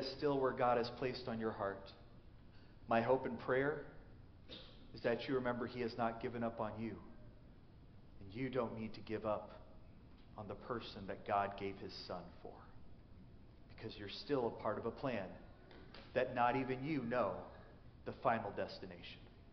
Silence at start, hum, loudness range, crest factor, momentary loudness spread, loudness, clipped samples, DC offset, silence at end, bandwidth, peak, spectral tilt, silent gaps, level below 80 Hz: 0 s; none; 6 LU; 20 dB; 24 LU; -41 LUFS; under 0.1%; under 0.1%; 0 s; 6.2 kHz; -22 dBFS; -4.5 dB/octave; none; -64 dBFS